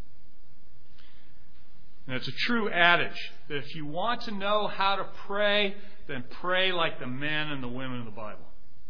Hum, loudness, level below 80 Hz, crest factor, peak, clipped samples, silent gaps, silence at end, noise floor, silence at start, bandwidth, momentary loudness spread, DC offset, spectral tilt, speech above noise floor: none; -28 LUFS; -58 dBFS; 26 dB; -4 dBFS; under 0.1%; none; 0.45 s; -58 dBFS; 2.05 s; 5.4 kHz; 17 LU; 4%; -5.5 dB/octave; 29 dB